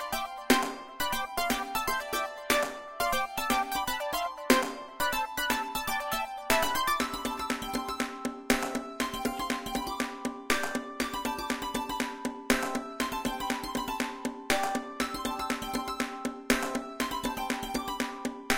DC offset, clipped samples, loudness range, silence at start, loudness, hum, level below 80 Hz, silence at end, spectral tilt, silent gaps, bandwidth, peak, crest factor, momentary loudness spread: under 0.1%; under 0.1%; 3 LU; 0 s; -31 LUFS; none; -52 dBFS; 0 s; -2.5 dB/octave; none; 17 kHz; -6 dBFS; 26 dB; 7 LU